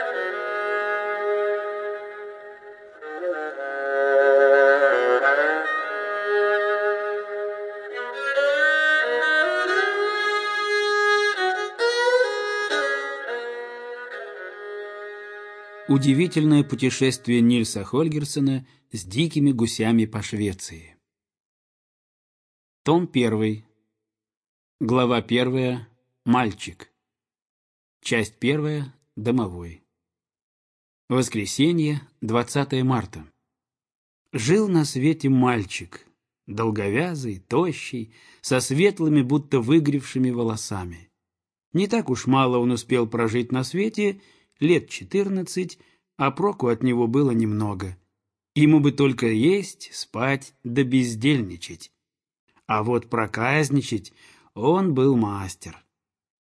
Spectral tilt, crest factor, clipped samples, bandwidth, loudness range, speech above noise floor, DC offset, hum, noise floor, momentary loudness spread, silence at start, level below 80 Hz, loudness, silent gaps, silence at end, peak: -5.5 dB/octave; 18 dB; under 0.1%; 11 kHz; 7 LU; 66 dB; under 0.1%; none; -88 dBFS; 16 LU; 0 s; -60 dBFS; -22 LUFS; 21.40-22.85 s, 24.37-24.41 s, 24.48-24.79 s, 27.42-28.00 s, 30.42-31.08 s, 33.95-34.25 s, 41.66-41.72 s, 52.39-52.47 s; 0.75 s; -6 dBFS